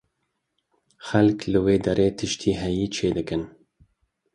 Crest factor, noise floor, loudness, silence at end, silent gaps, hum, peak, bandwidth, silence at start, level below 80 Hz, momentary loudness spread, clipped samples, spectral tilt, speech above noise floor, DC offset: 20 dB; -77 dBFS; -23 LUFS; 0.85 s; none; none; -4 dBFS; 11 kHz; 1 s; -46 dBFS; 10 LU; under 0.1%; -6 dB/octave; 54 dB; under 0.1%